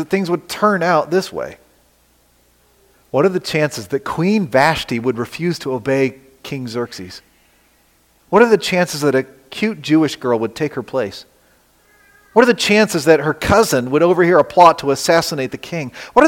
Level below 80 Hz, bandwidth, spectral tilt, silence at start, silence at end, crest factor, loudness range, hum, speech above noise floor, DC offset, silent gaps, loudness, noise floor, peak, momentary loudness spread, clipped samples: -48 dBFS; 17 kHz; -5 dB/octave; 0 s; 0 s; 16 dB; 8 LU; 60 Hz at -50 dBFS; 40 dB; under 0.1%; none; -16 LUFS; -56 dBFS; 0 dBFS; 14 LU; under 0.1%